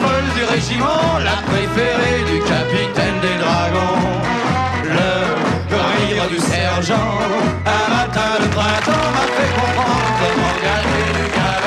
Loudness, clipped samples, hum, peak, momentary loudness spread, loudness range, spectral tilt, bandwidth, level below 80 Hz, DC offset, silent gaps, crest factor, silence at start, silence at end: -16 LUFS; under 0.1%; none; -6 dBFS; 2 LU; 1 LU; -5 dB/octave; 13.5 kHz; -34 dBFS; under 0.1%; none; 10 dB; 0 s; 0 s